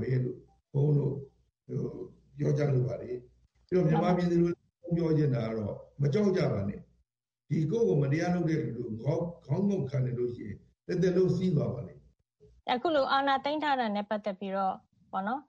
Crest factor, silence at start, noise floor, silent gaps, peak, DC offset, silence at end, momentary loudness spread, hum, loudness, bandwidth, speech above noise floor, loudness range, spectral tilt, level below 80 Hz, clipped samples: 18 dB; 0 s; -79 dBFS; none; -12 dBFS; under 0.1%; 0.05 s; 14 LU; none; -30 LUFS; 7.2 kHz; 50 dB; 3 LU; -8 dB/octave; -60 dBFS; under 0.1%